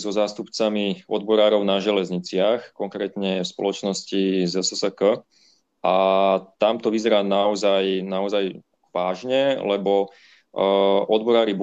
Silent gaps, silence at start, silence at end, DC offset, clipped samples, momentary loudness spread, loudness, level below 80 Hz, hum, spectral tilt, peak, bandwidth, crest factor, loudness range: none; 0 s; 0 s; under 0.1%; under 0.1%; 8 LU; -22 LUFS; -70 dBFS; none; -4.5 dB/octave; -6 dBFS; 8.6 kHz; 16 dB; 3 LU